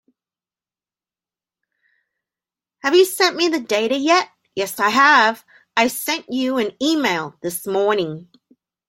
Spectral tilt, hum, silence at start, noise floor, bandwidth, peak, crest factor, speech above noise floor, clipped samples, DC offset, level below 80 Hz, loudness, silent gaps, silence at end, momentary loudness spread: -3 dB/octave; none; 2.85 s; under -90 dBFS; 16.5 kHz; -2 dBFS; 20 dB; over 72 dB; under 0.1%; under 0.1%; -68 dBFS; -18 LUFS; none; 0.65 s; 13 LU